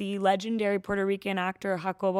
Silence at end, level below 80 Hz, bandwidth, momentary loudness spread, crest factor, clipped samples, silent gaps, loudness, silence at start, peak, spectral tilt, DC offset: 0 s; -62 dBFS; 14.5 kHz; 4 LU; 16 dB; under 0.1%; none; -29 LUFS; 0 s; -12 dBFS; -6 dB/octave; under 0.1%